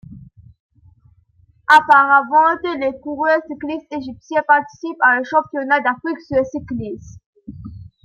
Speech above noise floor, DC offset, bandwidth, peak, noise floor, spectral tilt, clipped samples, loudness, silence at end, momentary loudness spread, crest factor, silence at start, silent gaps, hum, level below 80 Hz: 38 dB; under 0.1%; 12 kHz; -2 dBFS; -55 dBFS; -5 dB/octave; under 0.1%; -16 LUFS; 0.15 s; 19 LU; 18 dB; 0.1 s; 0.60-0.70 s, 7.26-7.33 s; none; -52 dBFS